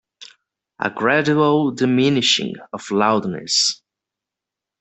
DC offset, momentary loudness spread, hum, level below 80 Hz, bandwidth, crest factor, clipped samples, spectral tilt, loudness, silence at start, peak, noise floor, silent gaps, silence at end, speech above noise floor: under 0.1%; 10 LU; none; -62 dBFS; 8.4 kHz; 18 dB; under 0.1%; -3.5 dB/octave; -18 LUFS; 0.2 s; -2 dBFS; -86 dBFS; none; 1.05 s; 68 dB